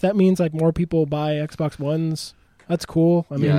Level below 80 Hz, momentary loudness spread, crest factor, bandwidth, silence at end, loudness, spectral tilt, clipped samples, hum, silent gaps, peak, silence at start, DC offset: -48 dBFS; 9 LU; 14 dB; 13.5 kHz; 0 s; -21 LUFS; -7.5 dB/octave; under 0.1%; none; none; -6 dBFS; 0.05 s; under 0.1%